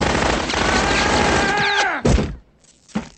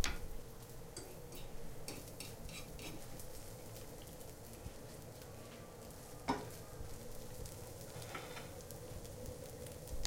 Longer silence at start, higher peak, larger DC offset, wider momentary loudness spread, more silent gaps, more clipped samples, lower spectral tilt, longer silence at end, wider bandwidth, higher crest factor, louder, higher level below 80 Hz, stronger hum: about the same, 0 s vs 0 s; first, -4 dBFS vs -16 dBFS; neither; first, 10 LU vs 7 LU; neither; neither; about the same, -4 dB/octave vs -4 dB/octave; about the same, 0.1 s vs 0 s; second, 8.8 kHz vs 17 kHz; second, 14 dB vs 30 dB; first, -17 LUFS vs -50 LUFS; first, -28 dBFS vs -54 dBFS; neither